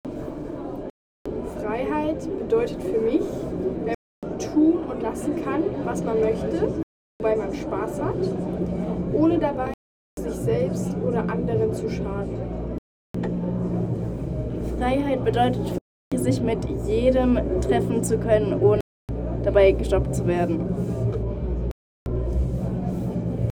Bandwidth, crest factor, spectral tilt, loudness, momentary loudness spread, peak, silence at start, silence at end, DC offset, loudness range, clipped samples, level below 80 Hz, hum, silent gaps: 16.5 kHz; 18 dB; -7.5 dB/octave; -25 LUFS; 12 LU; -6 dBFS; 0.05 s; 0 s; under 0.1%; 5 LU; under 0.1%; -36 dBFS; none; 0.90-1.25 s, 3.94-4.22 s, 6.83-7.20 s, 9.74-10.17 s, 12.78-13.14 s, 15.81-16.11 s, 18.81-19.08 s, 21.71-22.06 s